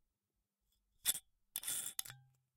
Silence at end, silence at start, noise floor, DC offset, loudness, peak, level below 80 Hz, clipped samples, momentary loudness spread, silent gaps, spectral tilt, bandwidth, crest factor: 0.35 s; 1.05 s; -90 dBFS; under 0.1%; -41 LUFS; -14 dBFS; -78 dBFS; under 0.1%; 14 LU; none; 1.5 dB/octave; 17.5 kHz; 32 dB